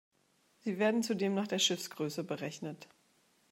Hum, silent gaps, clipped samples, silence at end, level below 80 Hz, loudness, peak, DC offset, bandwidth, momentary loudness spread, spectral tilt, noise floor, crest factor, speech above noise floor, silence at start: none; none; under 0.1%; 0.65 s; -86 dBFS; -34 LUFS; -16 dBFS; under 0.1%; 16 kHz; 13 LU; -3.5 dB/octave; -72 dBFS; 20 dB; 38 dB; 0.65 s